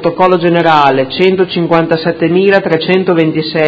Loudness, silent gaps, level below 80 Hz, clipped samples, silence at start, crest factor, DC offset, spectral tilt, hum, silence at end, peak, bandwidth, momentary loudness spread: -10 LUFS; none; -50 dBFS; 0.4%; 0 s; 10 dB; under 0.1%; -8 dB/octave; none; 0 s; 0 dBFS; 7.4 kHz; 4 LU